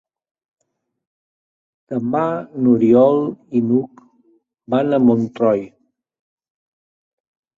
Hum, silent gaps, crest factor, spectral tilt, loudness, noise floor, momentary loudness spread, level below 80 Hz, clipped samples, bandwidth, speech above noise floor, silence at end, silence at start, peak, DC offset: none; none; 18 dB; -9.5 dB/octave; -17 LUFS; -59 dBFS; 11 LU; -62 dBFS; under 0.1%; 4.1 kHz; 43 dB; 1.9 s; 1.9 s; -2 dBFS; under 0.1%